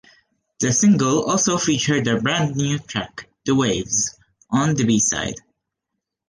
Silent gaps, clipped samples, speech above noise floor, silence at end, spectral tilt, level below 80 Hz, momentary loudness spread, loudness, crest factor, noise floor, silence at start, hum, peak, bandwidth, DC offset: none; under 0.1%; 61 dB; 0.9 s; -4 dB/octave; -52 dBFS; 11 LU; -19 LUFS; 14 dB; -81 dBFS; 0.6 s; none; -6 dBFS; 10.5 kHz; under 0.1%